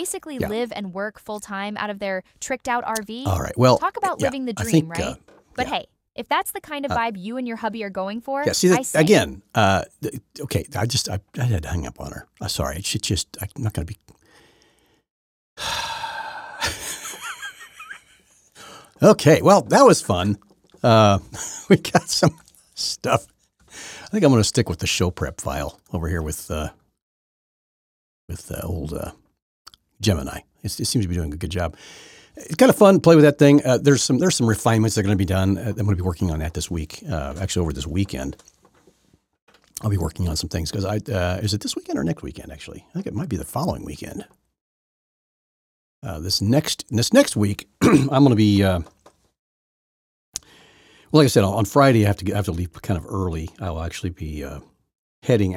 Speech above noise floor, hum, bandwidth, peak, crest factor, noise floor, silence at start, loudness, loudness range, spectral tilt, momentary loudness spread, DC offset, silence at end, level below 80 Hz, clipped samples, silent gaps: 42 dB; none; 17 kHz; 0 dBFS; 20 dB; -62 dBFS; 0 s; -21 LUFS; 13 LU; -5 dB/octave; 18 LU; under 0.1%; 0 s; -42 dBFS; under 0.1%; 15.10-15.56 s, 27.02-28.28 s, 29.42-29.65 s, 39.42-39.47 s, 44.61-46.02 s, 49.39-50.33 s, 54.98-55.22 s